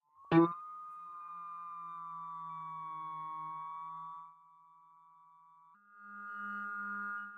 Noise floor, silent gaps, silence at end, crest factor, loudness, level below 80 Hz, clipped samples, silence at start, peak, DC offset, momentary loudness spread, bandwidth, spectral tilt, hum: -63 dBFS; none; 0 s; 24 dB; -39 LUFS; -78 dBFS; under 0.1%; 0.15 s; -16 dBFS; under 0.1%; 18 LU; 4.8 kHz; -9 dB/octave; none